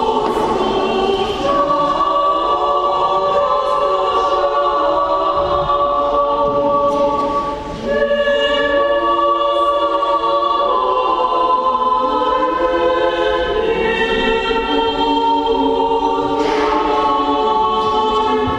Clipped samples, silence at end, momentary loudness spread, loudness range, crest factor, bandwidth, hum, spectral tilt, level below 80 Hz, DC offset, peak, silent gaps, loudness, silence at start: under 0.1%; 0 s; 2 LU; 1 LU; 12 dB; 10.5 kHz; none; -5 dB/octave; -38 dBFS; under 0.1%; -2 dBFS; none; -15 LUFS; 0 s